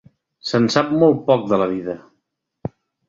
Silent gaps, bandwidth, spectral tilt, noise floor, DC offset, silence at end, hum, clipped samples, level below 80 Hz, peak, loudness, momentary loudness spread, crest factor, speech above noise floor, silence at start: none; 7.8 kHz; -6 dB/octave; -74 dBFS; under 0.1%; 0.4 s; none; under 0.1%; -56 dBFS; -2 dBFS; -18 LUFS; 18 LU; 18 dB; 56 dB; 0.45 s